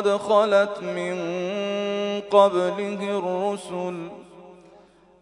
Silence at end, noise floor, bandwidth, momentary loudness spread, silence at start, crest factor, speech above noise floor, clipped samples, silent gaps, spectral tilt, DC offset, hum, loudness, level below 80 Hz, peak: 0.65 s; -53 dBFS; 11 kHz; 12 LU; 0 s; 20 dB; 30 dB; under 0.1%; none; -5.5 dB/octave; under 0.1%; none; -23 LUFS; -70 dBFS; -4 dBFS